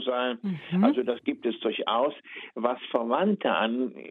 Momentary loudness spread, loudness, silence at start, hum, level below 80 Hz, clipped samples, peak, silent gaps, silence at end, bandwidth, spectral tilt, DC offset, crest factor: 7 LU; -27 LUFS; 0 s; none; -78 dBFS; under 0.1%; -10 dBFS; none; 0 s; 4.3 kHz; -9 dB/octave; under 0.1%; 18 dB